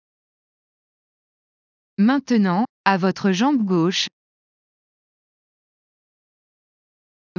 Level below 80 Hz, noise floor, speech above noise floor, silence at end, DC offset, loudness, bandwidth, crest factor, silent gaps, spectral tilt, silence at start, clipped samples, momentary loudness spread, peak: -74 dBFS; under -90 dBFS; over 71 dB; 3.3 s; under 0.1%; -20 LUFS; 7.4 kHz; 22 dB; 2.69-2.84 s; -5.5 dB/octave; 2 s; under 0.1%; 4 LU; -2 dBFS